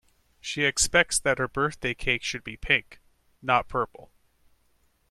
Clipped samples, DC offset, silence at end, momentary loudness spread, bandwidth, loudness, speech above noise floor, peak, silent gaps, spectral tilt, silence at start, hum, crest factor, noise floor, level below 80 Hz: under 0.1%; under 0.1%; 1.1 s; 13 LU; 15 kHz; -25 LUFS; 40 dB; -6 dBFS; none; -2 dB/octave; 0.45 s; none; 24 dB; -67 dBFS; -46 dBFS